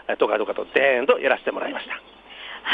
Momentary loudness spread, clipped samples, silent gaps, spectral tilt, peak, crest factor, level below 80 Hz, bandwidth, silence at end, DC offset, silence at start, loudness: 16 LU; under 0.1%; none; -5 dB/octave; -4 dBFS; 18 dB; -64 dBFS; 4.9 kHz; 0 s; under 0.1%; 0.1 s; -22 LUFS